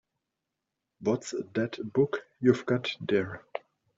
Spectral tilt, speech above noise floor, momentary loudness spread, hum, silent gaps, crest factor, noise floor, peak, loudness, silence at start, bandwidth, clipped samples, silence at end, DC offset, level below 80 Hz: -6 dB/octave; 57 dB; 11 LU; none; none; 22 dB; -86 dBFS; -10 dBFS; -30 LUFS; 1 s; 7.8 kHz; under 0.1%; 0.4 s; under 0.1%; -70 dBFS